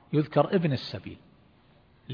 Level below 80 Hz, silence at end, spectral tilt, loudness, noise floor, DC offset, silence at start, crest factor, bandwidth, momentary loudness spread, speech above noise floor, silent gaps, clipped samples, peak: -64 dBFS; 0 s; -9 dB/octave; -27 LUFS; -60 dBFS; under 0.1%; 0.1 s; 20 dB; 5.4 kHz; 16 LU; 33 dB; none; under 0.1%; -8 dBFS